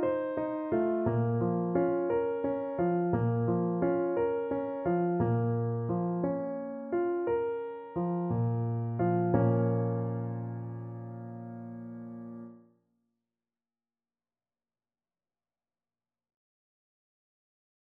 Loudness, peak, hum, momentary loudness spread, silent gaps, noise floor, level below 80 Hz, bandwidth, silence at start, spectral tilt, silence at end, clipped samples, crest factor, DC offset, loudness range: -31 LUFS; -12 dBFS; none; 14 LU; none; under -90 dBFS; -62 dBFS; 3.4 kHz; 0 s; -10.5 dB/octave; 5.2 s; under 0.1%; 20 dB; under 0.1%; 16 LU